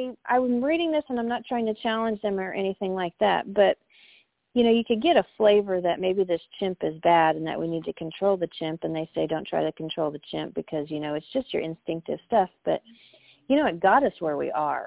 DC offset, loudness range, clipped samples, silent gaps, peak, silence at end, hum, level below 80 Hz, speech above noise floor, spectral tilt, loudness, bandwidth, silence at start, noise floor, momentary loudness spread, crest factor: under 0.1%; 6 LU; under 0.1%; none; -6 dBFS; 0 s; none; -62 dBFS; 34 dB; -9.5 dB/octave; -26 LUFS; 4 kHz; 0 s; -59 dBFS; 10 LU; 18 dB